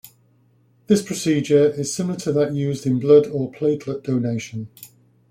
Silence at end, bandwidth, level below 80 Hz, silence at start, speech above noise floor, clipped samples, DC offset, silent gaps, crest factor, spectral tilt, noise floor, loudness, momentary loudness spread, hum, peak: 0.45 s; 15.5 kHz; -60 dBFS; 0.05 s; 39 dB; under 0.1%; under 0.1%; none; 18 dB; -6 dB/octave; -58 dBFS; -20 LUFS; 11 LU; none; -4 dBFS